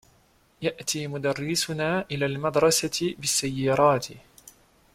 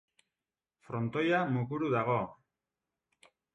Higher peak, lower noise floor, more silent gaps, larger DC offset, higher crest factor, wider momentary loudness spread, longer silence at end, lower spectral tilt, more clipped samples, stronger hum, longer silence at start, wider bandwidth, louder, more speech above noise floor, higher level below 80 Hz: first, -8 dBFS vs -18 dBFS; second, -62 dBFS vs under -90 dBFS; neither; neither; about the same, 20 dB vs 18 dB; about the same, 8 LU vs 9 LU; second, 0.45 s vs 1.2 s; second, -3.5 dB/octave vs -8 dB/octave; neither; neither; second, 0.6 s vs 0.9 s; first, 16.5 kHz vs 9.4 kHz; first, -25 LUFS vs -32 LUFS; second, 36 dB vs over 59 dB; first, -58 dBFS vs -70 dBFS